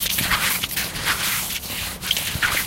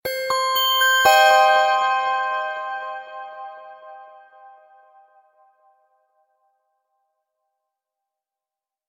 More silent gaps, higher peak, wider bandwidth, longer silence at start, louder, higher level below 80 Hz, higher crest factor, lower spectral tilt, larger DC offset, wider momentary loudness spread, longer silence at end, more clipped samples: neither; about the same, -4 dBFS vs -2 dBFS; about the same, 17 kHz vs 16.5 kHz; about the same, 0 s vs 0.05 s; second, -21 LUFS vs -17 LUFS; first, -40 dBFS vs -68 dBFS; about the same, 20 dB vs 20 dB; first, -1 dB/octave vs 1 dB/octave; neither; second, 6 LU vs 23 LU; second, 0 s vs 4.8 s; neither